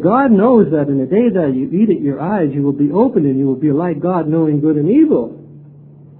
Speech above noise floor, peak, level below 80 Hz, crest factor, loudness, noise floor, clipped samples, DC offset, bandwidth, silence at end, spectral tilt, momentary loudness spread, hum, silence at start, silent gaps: 26 dB; 0 dBFS; -52 dBFS; 14 dB; -14 LUFS; -39 dBFS; under 0.1%; under 0.1%; 4.1 kHz; 0.6 s; -13.5 dB/octave; 6 LU; none; 0 s; none